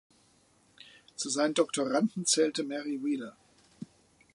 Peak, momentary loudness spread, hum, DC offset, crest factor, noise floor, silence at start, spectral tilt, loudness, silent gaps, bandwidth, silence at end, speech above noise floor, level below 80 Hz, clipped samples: -12 dBFS; 22 LU; none; under 0.1%; 20 dB; -66 dBFS; 0.85 s; -3 dB/octave; -30 LUFS; none; 11.5 kHz; 0.5 s; 36 dB; -78 dBFS; under 0.1%